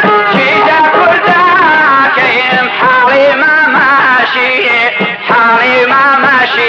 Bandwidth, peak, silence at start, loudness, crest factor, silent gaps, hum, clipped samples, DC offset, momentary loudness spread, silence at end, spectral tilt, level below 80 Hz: 7.8 kHz; 0 dBFS; 0 s; -7 LUFS; 8 dB; none; none; under 0.1%; under 0.1%; 3 LU; 0 s; -5 dB/octave; -60 dBFS